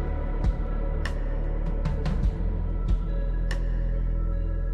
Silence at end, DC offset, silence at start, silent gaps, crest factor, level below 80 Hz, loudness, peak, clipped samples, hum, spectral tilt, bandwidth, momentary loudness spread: 0 s; under 0.1%; 0 s; none; 12 dB; -26 dBFS; -30 LUFS; -14 dBFS; under 0.1%; none; -8 dB/octave; 5.8 kHz; 3 LU